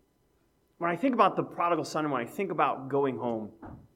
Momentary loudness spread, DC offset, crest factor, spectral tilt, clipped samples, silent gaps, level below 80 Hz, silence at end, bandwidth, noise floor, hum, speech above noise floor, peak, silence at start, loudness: 9 LU; under 0.1%; 22 dB; -6 dB/octave; under 0.1%; none; -68 dBFS; 0.15 s; 16 kHz; -70 dBFS; none; 40 dB; -8 dBFS; 0.8 s; -29 LUFS